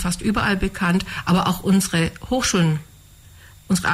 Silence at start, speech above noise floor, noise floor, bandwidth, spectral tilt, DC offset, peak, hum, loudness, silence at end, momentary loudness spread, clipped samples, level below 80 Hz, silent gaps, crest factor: 0 s; 27 dB; -46 dBFS; 16 kHz; -4.5 dB/octave; under 0.1%; -8 dBFS; none; -20 LUFS; 0 s; 4 LU; under 0.1%; -38 dBFS; none; 12 dB